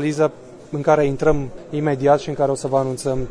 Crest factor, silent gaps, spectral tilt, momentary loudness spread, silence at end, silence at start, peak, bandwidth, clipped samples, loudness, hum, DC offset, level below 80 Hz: 16 dB; none; -6.5 dB/octave; 7 LU; 0 s; 0 s; -4 dBFS; 11 kHz; under 0.1%; -20 LUFS; none; under 0.1%; -38 dBFS